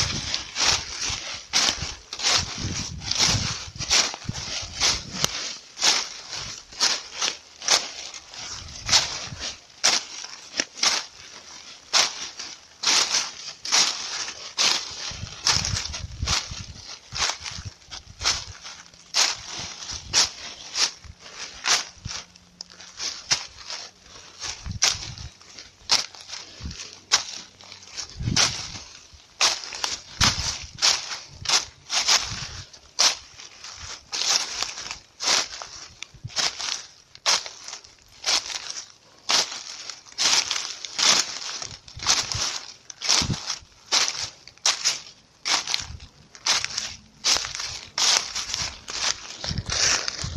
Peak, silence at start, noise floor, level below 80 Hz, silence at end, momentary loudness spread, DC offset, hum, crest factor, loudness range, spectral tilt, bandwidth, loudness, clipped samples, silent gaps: -2 dBFS; 0 s; -48 dBFS; -48 dBFS; 0 s; 18 LU; under 0.1%; none; 26 dB; 4 LU; 0 dB/octave; 15.5 kHz; -23 LUFS; under 0.1%; none